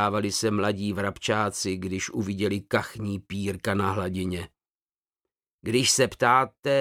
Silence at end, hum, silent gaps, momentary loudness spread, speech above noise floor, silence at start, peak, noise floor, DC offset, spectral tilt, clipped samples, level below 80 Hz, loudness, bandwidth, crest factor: 0 s; none; 5.53-5.59 s, 6.59-6.63 s; 11 LU; over 64 dB; 0 s; -6 dBFS; under -90 dBFS; under 0.1%; -4 dB/octave; under 0.1%; -58 dBFS; -26 LUFS; 16.5 kHz; 20 dB